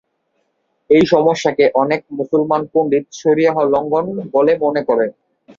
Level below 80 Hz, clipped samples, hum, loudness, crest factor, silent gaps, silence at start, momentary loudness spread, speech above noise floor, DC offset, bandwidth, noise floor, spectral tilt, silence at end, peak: -58 dBFS; under 0.1%; none; -15 LUFS; 16 dB; none; 0.9 s; 6 LU; 52 dB; under 0.1%; 7.6 kHz; -67 dBFS; -6 dB/octave; 0.45 s; 0 dBFS